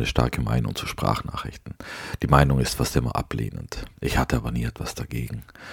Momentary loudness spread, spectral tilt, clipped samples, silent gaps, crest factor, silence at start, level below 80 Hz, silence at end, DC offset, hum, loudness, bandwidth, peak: 15 LU; -5.5 dB/octave; under 0.1%; none; 24 dB; 0 s; -34 dBFS; 0 s; under 0.1%; none; -25 LUFS; 18 kHz; 0 dBFS